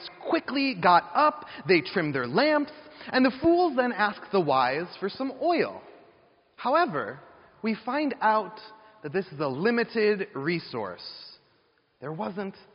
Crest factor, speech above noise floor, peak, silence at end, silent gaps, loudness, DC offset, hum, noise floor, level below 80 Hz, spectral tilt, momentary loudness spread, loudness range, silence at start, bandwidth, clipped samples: 20 dB; 41 dB; -6 dBFS; 0.25 s; none; -26 LUFS; under 0.1%; none; -67 dBFS; -66 dBFS; -3.5 dB/octave; 15 LU; 5 LU; 0 s; 5.6 kHz; under 0.1%